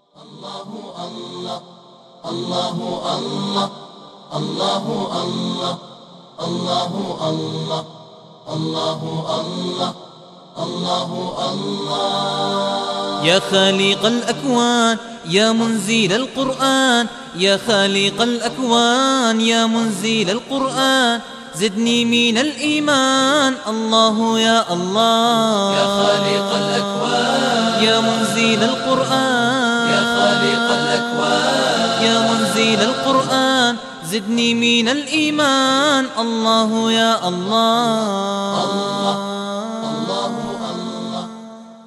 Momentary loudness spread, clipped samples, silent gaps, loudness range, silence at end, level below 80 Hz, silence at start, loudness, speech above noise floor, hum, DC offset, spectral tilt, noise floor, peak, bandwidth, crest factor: 11 LU; under 0.1%; none; 8 LU; 0.05 s; -60 dBFS; 0.2 s; -17 LUFS; 24 dB; none; under 0.1%; -3.5 dB/octave; -41 dBFS; -2 dBFS; 13.5 kHz; 16 dB